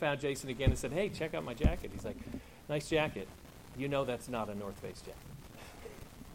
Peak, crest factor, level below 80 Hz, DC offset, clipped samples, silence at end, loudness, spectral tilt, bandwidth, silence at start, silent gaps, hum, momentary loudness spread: -14 dBFS; 22 dB; -44 dBFS; under 0.1%; under 0.1%; 0 s; -37 LUFS; -5.5 dB/octave; 16.5 kHz; 0 s; none; none; 17 LU